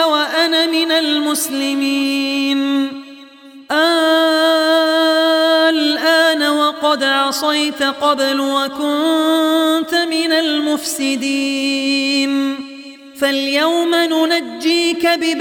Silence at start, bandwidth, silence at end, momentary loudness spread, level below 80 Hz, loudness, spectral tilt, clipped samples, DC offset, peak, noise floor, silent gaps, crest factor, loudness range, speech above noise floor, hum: 0 s; 17.5 kHz; 0 s; 5 LU; -66 dBFS; -15 LUFS; -1 dB/octave; under 0.1%; under 0.1%; -2 dBFS; -39 dBFS; none; 14 dB; 4 LU; 23 dB; none